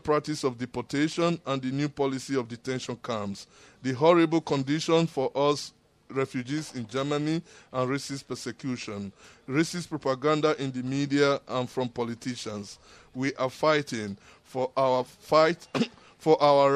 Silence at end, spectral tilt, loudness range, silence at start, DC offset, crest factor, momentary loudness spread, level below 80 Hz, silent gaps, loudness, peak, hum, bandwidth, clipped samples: 0 s; -5.5 dB/octave; 5 LU; 0.05 s; under 0.1%; 20 dB; 13 LU; -66 dBFS; none; -28 LUFS; -6 dBFS; none; 14 kHz; under 0.1%